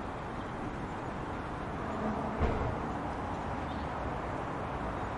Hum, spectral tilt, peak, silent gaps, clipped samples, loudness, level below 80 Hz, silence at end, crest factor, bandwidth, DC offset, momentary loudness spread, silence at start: none; -7 dB/octave; -16 dBFS; none; under 0.1%; -37 LUFS; -44 dBFS; 0 s; 20 dB; 11.5 kHz; under 0.1%; 6 LU; 0 s